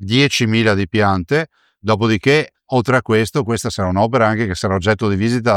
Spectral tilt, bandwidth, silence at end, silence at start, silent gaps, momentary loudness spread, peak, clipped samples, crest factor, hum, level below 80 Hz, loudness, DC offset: -5.5 dB/octave; 15.5 kHz; 0 s; 0 s; none; 5 LU; -2 dBFS; under 0.1%; 14 dB; none; -46 dBFS; -16 LUFS; under 0.1%